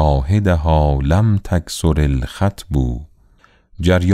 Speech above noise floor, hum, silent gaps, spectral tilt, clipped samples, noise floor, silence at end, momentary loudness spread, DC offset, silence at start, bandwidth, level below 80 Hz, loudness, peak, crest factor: 37 dB; none; none; -7 dB/octave; under 0.1%; -52 dBFS; 0 s; 6 LU; under 0.1%; 0 s; 14 kHz; -24 dBFS; -17 LUFS; -2 dBFS; 14 dB